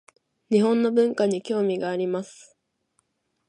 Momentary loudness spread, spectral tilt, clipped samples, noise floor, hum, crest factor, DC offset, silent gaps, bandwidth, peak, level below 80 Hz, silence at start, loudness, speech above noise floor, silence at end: 8 LU; -6.5 dB/octave; under 0.1%; -72 dBFS; none; 18 dB; under 0.1%; none; 11 kHz; -8 dBFS; -76 dBFS; 0.5 s; -23 LUFS; 49 dB; 1.15 s